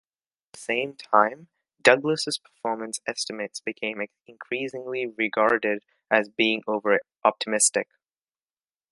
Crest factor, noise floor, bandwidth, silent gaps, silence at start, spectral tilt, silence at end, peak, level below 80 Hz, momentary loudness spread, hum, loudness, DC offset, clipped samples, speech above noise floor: 26 dB; under -90 dBFS; 11.5 kHz; none; 0.55 s; -2 dB/octave; 1.1 s; 0 dBFS; -74 dBFS; 11 LU; none; -25 LUFS; under 0.1%; under 0.1%; over 65 dB